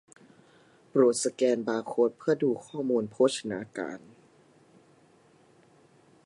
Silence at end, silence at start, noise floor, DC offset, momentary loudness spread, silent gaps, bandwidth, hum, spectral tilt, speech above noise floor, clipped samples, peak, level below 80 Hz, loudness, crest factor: 2.3 s; 0.95 s; -61 dBFS; under 0.1%; 12 LU; none; 11.5 kHz; none; -4.5 dB/octave; 33 dB; under 0.1%; -10 dBFS; -78 dBFS; -28 LUFS; 20 dB